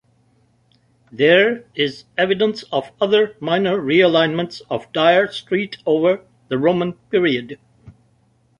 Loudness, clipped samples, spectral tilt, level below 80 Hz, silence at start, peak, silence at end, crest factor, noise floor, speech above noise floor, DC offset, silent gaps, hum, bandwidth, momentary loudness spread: -18 LUFS; under 0.1%; -6.5 dB/octave; -60 dBFS; 1.15 s; -2 dBFS; 0.7 s; 18 dB; -59 dBFS; 41 dB; under 0.1%; none; none; 10.5 kHz; 11 LU